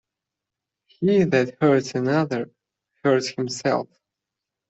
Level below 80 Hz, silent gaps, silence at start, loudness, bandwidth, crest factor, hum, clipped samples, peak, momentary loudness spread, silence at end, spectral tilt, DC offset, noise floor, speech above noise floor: -64 dBFS; none; 1 s; -22 LUFS; 8.2 kHz; 18 dB; none; under 0.1%; -4 dBFS; 8 LU; 0.85 s; -6 dB/octave; under 0.1%; -86 dBFS; 65 dB